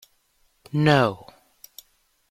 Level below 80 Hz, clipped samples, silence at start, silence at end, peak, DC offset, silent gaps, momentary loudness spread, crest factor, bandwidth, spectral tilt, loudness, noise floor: -60 dBFS; under 0.1%; 0.75 s; 1.15 s; -6 dBFS; under 0.1%; none; 27 LU; 20 dB; 15.5 kHz; -6.5 dB/octave; -21 LUFS; -66 dBFS